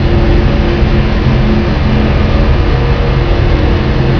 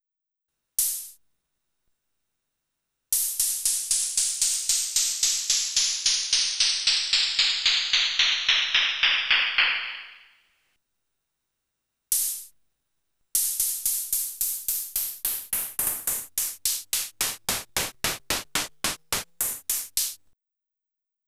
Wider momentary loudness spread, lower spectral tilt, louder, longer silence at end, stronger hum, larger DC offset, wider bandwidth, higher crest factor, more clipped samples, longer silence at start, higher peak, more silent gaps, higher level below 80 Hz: second, 1 LU vs 9 LU; first, -8 dB/octave vs 2 dB/octave; first, -11 LUFS vs -23 LUFS; second, 0 s vs 1.1 s; neither; neither; second, 5.4 kHz vs over 20 kHz; second, 8 dB vs 20 dB; neither; second, 0 s vs 0.8 s; first, 0 dBFS vs -8 dBFS; neither; first, -12 dBFS vs -58 dBFS